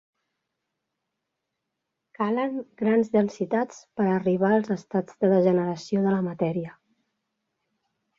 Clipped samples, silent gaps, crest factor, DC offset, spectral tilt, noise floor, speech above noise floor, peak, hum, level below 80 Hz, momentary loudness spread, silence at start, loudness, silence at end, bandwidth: under 0.1%; none; 18 dB; under 0.1%; -8 dB/octave; -82 dBFS; 58 dB; -8 dBFS; none; -70 dBFS; 9 LU; 2.2 s; -25 LUFS; 1.45 s; 7.4 kHz